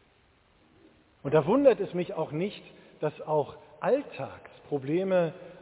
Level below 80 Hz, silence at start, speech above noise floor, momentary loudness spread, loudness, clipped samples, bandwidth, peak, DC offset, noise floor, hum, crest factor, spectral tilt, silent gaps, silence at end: -66 dBFS; 1.25 s; 36 dB; 17 LU; -28 LUFS; under 0.1%; 4 kHz; -8 dBFS; under 0.1%; -64 dBFS; none; 20 dB; -11 dB/octave; none; 0.1 s